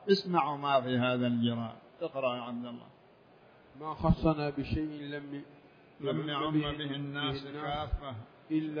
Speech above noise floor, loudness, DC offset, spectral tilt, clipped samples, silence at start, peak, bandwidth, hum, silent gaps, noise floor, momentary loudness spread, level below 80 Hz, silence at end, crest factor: 27 dB; -33 LUFS; under 0.1%; -8 dB/octave; under 0.1%; 0 s; -12 dBFS; 5.2 kHz; none; none; -60 dBFS; 15 LU; -48 dBFS; 0 s; 20 dB